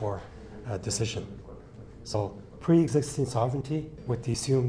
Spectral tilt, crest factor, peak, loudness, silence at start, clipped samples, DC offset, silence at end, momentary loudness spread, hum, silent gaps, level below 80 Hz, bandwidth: -6 dB/octave; 18 dB; -12 dBFS; -29 LUFS; 0 s; under 0.1%; under 0.1%; 0 s; 21 LU; none; none; -52 dBFS; 11 kHz